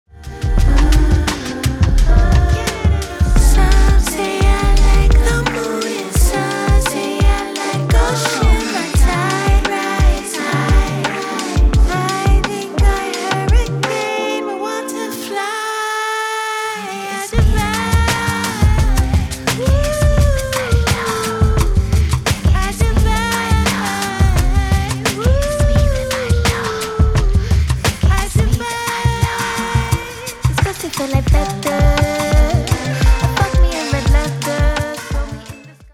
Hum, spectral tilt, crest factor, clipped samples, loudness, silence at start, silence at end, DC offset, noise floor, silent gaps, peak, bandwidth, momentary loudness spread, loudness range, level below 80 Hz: none; -5 dB/octave; 14 dB; under 0.1%; -16 LUFS; 0.15 s; 0.1 s; under 0.1%; -36 dBFS; none; 0 dBFS; 16 kHz; 6 LU; 3 LU; -16 dBFS